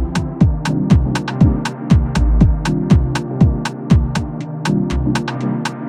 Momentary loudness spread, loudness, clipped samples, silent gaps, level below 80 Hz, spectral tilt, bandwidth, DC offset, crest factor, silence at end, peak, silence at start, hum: 7 LU; -16 LUFS; under 0.1%; none; -20 dBFS; -7 dB/octave; 11.5 kHz; under 0.1%; 14 dB; 0 s; 0 dBFS; 0 s; none